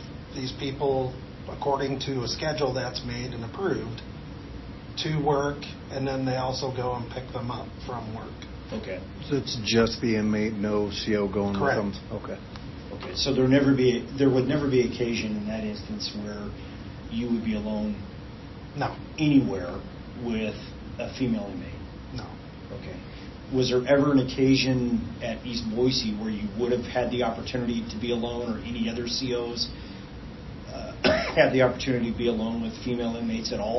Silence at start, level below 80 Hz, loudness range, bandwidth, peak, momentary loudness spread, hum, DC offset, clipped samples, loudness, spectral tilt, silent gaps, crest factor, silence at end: 0 s; -46 dBFS; 7 LU; 6.2 kHz; -6 dBFS; 17 LU; none; under 0.1%; under 0.1%; -27 LUFS; -6 dB/octave; none; 22 dB; 0 s